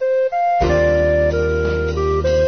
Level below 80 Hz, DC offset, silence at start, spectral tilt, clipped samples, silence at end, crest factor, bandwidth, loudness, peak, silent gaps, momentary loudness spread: -26 dBFS; 0.3%; 0 s; -7 dB/octave; under 0.1%; 0 s; 12 dB; 6.6 kHz; -17 LUFS; -4 dBFS; none; 4 LU